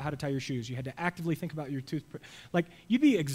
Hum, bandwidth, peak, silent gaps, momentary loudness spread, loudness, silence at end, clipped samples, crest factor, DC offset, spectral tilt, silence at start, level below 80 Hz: none; 16 kHz; -14 dBFS; none; 13 LU; -32 LUFS; 0 s; under 0.1%; 18 dB; under 0.1%; -6.5 dB/octave; 0 s; -62 dBFS